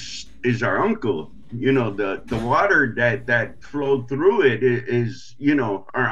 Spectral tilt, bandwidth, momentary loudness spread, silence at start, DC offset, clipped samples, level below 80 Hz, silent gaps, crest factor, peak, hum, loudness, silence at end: -6.5 dB/octave; 7.8 kHz; 10 LU; 0 s; 1%; under 0.1%; -50 dBFS; none; 16 dB; -4 dBFS; none; -21 LUFS; 0 s